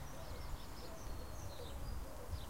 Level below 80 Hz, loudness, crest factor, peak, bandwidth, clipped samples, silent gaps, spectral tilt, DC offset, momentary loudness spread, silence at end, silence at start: -50 dBFS; -50 LUFS; 14 dB; -32 dBFS; 16 kHz; under 0.1%; none; -5 dB/octave; 0.3%; 2 LU; 0 s; 0 s